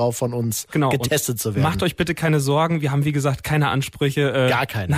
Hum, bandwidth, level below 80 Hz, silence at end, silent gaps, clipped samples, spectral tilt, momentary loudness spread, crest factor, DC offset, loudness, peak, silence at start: none; 16 kHz; -46 dBFS; 0 s; none; under 0.1%; -5 dB/octave; 4 LU; 12 dB; under 0.1%; -21 LUFS; -8 dBFS; 0 s